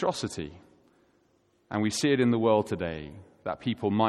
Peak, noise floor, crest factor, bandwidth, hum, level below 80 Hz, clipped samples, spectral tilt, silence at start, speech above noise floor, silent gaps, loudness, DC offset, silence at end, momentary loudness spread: -10 dBFS; -68 dBFS; 20 dB; 13 kHz; none; -58 dBFS; under 0.1%; -5.5 dB/octave; 0 s; 40 dB; none; -28 LUFS; under 0.1%; 0 s; 16 LU